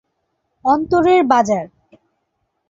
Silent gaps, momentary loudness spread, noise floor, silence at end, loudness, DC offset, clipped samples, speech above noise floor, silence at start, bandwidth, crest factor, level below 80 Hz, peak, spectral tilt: none; 10 LU; -71 dBFS; 1.05 s; -15 LUFS; under 0.1%; under 0.1%; 57 dB; 0.65 s; 7.6 kHz; 16 dB; -52 dBFS; -2 dBFS; -5.5 dB/octave